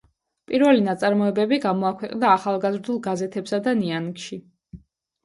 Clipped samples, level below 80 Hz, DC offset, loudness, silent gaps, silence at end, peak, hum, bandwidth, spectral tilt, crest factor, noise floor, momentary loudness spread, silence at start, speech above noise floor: under 0.1%; -62 dBFS; under 0.1%; -22 LUFS; none; 0.45 s; -4 dBFS; none; 11.5 kHz; -6 dB/octave; 20 dB; -48 dBFS; 11 LU; 0.5 s; 26 dB